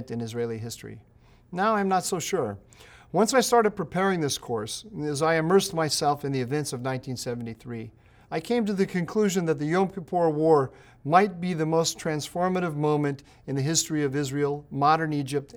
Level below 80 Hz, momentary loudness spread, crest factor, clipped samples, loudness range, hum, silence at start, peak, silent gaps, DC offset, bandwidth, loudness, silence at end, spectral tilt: -60 dBFS; 13 LU; 20 dB; under 0.1%; 4 LU; none; 0 s; -6 dBFS; none; under 0.1%; 20 kHz; -26 LUFS; 0 s; -4.5 dB/octave